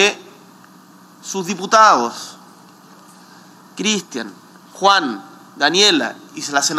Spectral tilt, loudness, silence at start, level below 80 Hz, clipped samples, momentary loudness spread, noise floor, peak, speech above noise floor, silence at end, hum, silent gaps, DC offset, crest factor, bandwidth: -2 dB/octave; -16 LUFS; 0 s; -76 dBFS; under 0.1%; 21 LU; -45 dBFS; 0 dBFS; 29 dB; 0 s; none; none; under 0.1%; 20 dB; 16.5 kHz